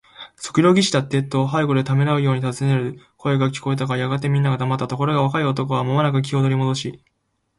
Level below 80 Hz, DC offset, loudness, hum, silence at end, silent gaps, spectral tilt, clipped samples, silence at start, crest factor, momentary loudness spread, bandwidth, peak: -58 dBFS; under 0.1%; -20 LUFS; none; 0.65 s; none; -6.5 dB/octave; under 0.1%; 0.2 s; 16 dB; 6 LU; 11.5 kHz; -2 dBFS